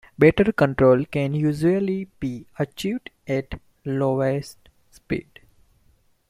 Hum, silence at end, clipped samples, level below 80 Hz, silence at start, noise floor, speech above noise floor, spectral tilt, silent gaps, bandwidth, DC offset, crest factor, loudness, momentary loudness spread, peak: none; 1.1 s; under 0.1%; -48 dBFS; 0.2 s; -61 dBFS; 39 dB; -7.5 dB/octave; none; 15 kHz; under 0.1%; 20 dB; -22 LUFS; 14 LU; -2 dBFS